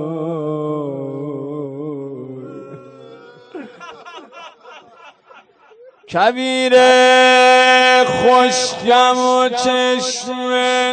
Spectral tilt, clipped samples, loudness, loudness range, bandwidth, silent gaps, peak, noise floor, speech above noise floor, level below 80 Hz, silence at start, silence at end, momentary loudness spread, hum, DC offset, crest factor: -3 dB/octave; under 0.1%; -13 LUFS; 20 LU; 9.4 kHz; none; -2 dBFS; -47 dBFS; 34 dB; -60 dBFS; 0 s; 0 s; 24 LU; none; under 0.1%; 14 dB